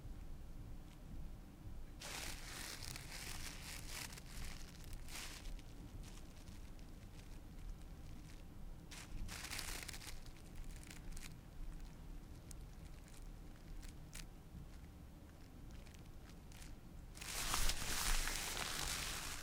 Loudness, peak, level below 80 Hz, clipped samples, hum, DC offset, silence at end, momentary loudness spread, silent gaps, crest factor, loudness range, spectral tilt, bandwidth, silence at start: -49 LUFS; -20 dBFS; -50 dBFS; under 0.1%; none; under 0.1%; 0 s; 17 LU; none; 28 dB; 13 LU; -2 dB/octave; 17.5 kHz; 0 s